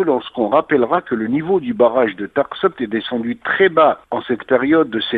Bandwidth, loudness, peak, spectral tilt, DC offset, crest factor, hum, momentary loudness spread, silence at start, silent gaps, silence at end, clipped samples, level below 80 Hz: 4.7 kHz; -17 LUFS; -2 dBFS; -8.5 dB/octave; under 0.1%; 16 dB; none; 8 LU; 0 s; none; 0 s; under 0.1%; -56 dBFS